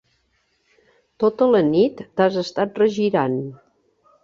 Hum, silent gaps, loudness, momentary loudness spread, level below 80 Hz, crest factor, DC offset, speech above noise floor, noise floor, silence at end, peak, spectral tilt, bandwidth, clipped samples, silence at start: none; none; -20 LUFS; 8 LU; -62 dBFS; 18 dB; under 0.1%; 48 dB; -67 dBFS; 0.7 s; -4 dBFS; -7 dB/octave; 7.4 kHz; under 0.1%; 1.2 s